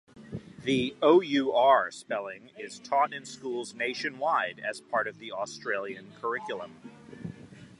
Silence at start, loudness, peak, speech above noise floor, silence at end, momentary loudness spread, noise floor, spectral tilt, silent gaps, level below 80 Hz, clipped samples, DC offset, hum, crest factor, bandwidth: 0.15 s; -29 LUFS; -8 dBFS; 19 dB; 0.15 s; 21 LU; -47 dBFS; -4.5 dB/octave; none; -68 dBFS; under 0.1%; under 0.1%; none; 20 dB; 11.5 kHz